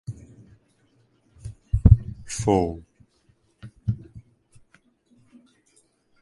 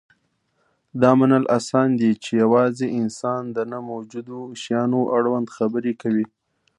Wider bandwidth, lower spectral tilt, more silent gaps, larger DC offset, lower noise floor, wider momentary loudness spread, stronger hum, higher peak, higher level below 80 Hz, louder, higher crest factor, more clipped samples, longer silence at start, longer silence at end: about the same, 11.5 kHz vs 11 kHz; about the same, -7.5 dB/octave vs -7 dB/octave; neither; neither; second, -64 dBFS vs -69 dBFS; first, 28 LU vs 15 LU; neither; about the same, 0 dBFS vs -2 dBFS; first, -32 dBFS vs -66 dBFS; about the same, -23 LUFS vs -21 LUFS; first, 26 dB vs 20 dB; neither; second, 0.1 s vs 0.95 s; first, 2 s vs 0.5 s